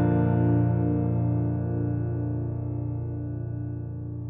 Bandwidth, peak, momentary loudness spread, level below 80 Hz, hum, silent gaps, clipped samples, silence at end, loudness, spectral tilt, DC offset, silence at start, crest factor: 2.8 kHz; -12 dBFS; 10 LU; -48 dBFS; none; none; under 0.1%; 0 s; -27 LUFS; -12 dB/octave; under 0.1%; 0 s; 14 dB